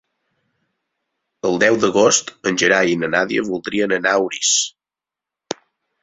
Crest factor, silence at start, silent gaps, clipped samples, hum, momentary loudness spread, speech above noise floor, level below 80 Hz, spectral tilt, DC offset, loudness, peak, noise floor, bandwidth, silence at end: 18 dB; 1.45 s; none; under 0.1%; none; 12 LU; 71 dB; -60 dBFS; -2.5 dB/octave; under 0.1%; -17 LUFS; -2 dBFS; -88 dBFS; 8.4 kHz; 0.5 s